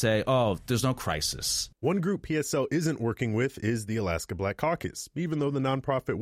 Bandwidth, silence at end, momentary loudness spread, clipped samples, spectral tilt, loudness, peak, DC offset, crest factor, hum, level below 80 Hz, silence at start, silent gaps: 16 kHz; 0 s; 5 LU; under 0.1%; -5 dB/octave; -29 LUFS; -14 dBFS; under 0.1%; 14 dB; none; -50 dBFS; 0 s; none